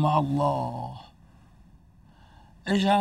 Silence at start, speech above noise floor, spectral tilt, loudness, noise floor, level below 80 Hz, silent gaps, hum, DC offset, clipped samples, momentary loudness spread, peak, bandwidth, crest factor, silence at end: 0 s; 30 dB; -7 dB/octave; -27 LUFS; -55 dBFS; -56 dBFS; none; none; under 0.1%; under 0.1%; 16 LU; -8 dBFS; 12.5 kHz; 20 dB; 0 s